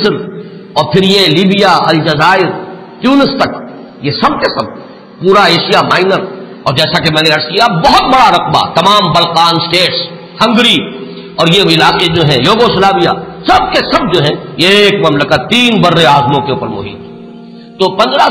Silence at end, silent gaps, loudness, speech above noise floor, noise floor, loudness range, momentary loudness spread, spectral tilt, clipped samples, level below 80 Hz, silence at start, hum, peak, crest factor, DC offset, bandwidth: 0 s; none; -8 LUFS; 22 dB; -30 dBFS; 3 LU; 13 LU; -5 dB/octave; under 0.1%; -38 dBFS; 0 s; none; 0 dBFS; 10 dB; 0.1%; 16.5 kHz